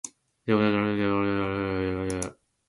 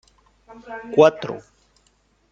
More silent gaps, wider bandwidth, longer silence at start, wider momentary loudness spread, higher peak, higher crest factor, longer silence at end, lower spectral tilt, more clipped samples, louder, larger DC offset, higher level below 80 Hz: neither; first, 11.5 kHz vs 7.8 kHz; second, 0.05 s vs 0.7 s; second, 13 LU vs 21 LU; second, -10 dBFS vs -2 dBFS; about the same, 18 dB vs 22 dB; second, 0.35 s vs 0.95 s; about the same, -5.5 dB/octave vs -6 dB/octave; neither; second, -27 LUFS vs -18 LUFS; neither; first, -50 dBFS vs -62 dBFS